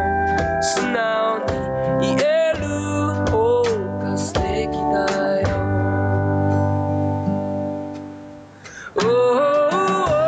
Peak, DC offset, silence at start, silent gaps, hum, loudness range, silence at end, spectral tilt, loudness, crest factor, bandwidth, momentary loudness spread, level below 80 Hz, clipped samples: -10 dBFS; under 0.1%; 0 s; none; none; 2 LU; 0 s; -6 dB/octave; -20 LUFS; 10 dB; 9.4 kHz; 10 LU; -40 dBFS; under 0.1%